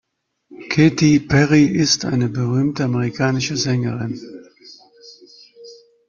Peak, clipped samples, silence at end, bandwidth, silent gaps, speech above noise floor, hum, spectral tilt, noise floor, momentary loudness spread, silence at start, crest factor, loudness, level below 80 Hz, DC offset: -2 dBFS; under 0.1%; 0.35 s; 7.4 kHz; none; 36 dB; none; -5 dB/octave; -53 dBFS; 11 LU; 0.5 s; 16 dB; -17 LUFS; -50 dBFS; under 0.1%